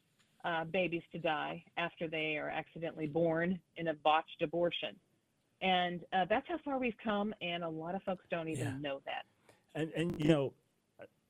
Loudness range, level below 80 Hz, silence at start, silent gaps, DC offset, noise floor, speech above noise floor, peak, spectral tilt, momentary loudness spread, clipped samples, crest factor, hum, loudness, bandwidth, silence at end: 4 LU; -68 dBFS; 0.45 s; none; under 0.1%; -77 dBFS; 41 dB; -16 dBFS; -6 dB/octave; 9 LU; under 0.1%; 22 dB; none; -36 LUFS; 13 kHz; 0.25 s